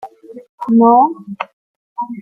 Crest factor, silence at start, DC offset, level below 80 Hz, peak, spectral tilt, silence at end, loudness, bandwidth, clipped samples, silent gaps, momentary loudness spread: 14 dB; 0.05 s; under 0.1%; -64 dBFS; -2 dBFS; -9 dB/octave; 0 s; -12 LUFS; 3.5 kHz; under 0.1%; 0.49-0.58 s, 1.53-1.96 s; 21 LU